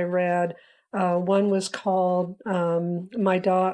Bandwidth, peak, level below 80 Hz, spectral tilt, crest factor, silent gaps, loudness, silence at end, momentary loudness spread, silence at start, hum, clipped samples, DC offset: 10.5 kHz; -10 dBFS; -76 dBFS; -6.5 dB/octave; 14 dB; none; -24 LUFS; 0 s; 6 LU; 0 s; none; under 0.1%; under 0.1%